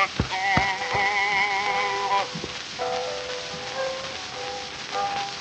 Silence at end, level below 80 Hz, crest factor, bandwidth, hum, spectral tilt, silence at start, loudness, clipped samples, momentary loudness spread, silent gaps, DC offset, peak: 0 s; -48 dBFS; 24 dB; 9 kHz; none; -3 dB/octave; 0 s; -25 LUFS; under 0.1%; 10 LU; none; under 0.1%; -2 dBFS